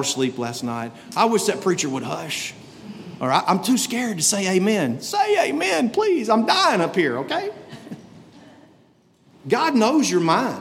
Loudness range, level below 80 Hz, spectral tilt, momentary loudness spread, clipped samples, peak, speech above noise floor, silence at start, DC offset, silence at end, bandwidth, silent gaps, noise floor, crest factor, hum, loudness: 5 LU; -70 dBFS; -3.5 dB/octave; 19 LU; under 0.1%; -4 dBFS; 36 dB; 0 s; under 0.1%; 0 s; 16.5 kHz; none; -57 dBFS; 18 dB; none; -20 LUFS